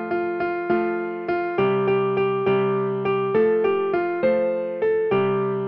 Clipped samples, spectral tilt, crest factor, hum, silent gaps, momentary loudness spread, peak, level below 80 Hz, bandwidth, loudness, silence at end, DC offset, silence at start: under 0.1%; -9.5 dB/octave; 12 dB; none; none; 5 LU; -10 dBFS; -60 dBFS; 5.4 kHz; -22 LUFS; 0 s; under 0.1%; 0 s